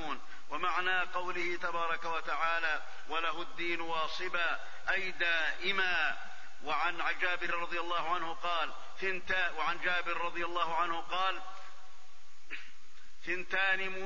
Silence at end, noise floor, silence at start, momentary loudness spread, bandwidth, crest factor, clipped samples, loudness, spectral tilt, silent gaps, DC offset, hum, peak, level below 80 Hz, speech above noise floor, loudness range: 0 s; -60 dBFS; 0 s; 12 LU; 7.4 kHz; 18 dB; under 0.1%; -34 LUFS; -3 dB/octave; none; 2%; none; -18 dBFS; -62 dBFS; 26 dB; 3 LU